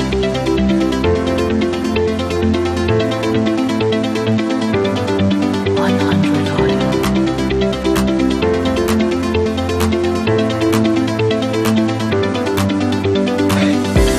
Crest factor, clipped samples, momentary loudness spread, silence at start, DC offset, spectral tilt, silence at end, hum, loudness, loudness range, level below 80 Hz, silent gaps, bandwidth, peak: 12 dB; under 0.1%; 2 LU; 0 s; under 0.1%; -6 dB/octave; 0 s; none; -16 LUFS; 1 LU; -30 dBFS; none; 15.5 kHz; -2 dBFS